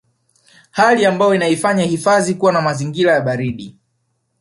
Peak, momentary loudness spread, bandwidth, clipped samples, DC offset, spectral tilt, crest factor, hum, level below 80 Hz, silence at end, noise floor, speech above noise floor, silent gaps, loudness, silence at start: -2 dBFS; 9 LU; 11.5 kHz; under 0.1%; under 0.1%; -5 dB/octave; 16 dB; none; -56 dBFS; 0.7 s; -67 dBFS; 53 dB; none; -15 LUFS; 0.75 s